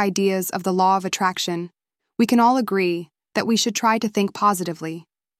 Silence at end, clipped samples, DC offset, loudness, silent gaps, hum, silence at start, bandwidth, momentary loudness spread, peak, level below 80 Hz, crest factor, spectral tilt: 0.4 s; under 0.1%; under 0.1%; -21 LUFS; none; none; 0 s; 16 kHz; 13 LU; -6 dBFS; -70 dBFS; 16 dB; -4 dB/octave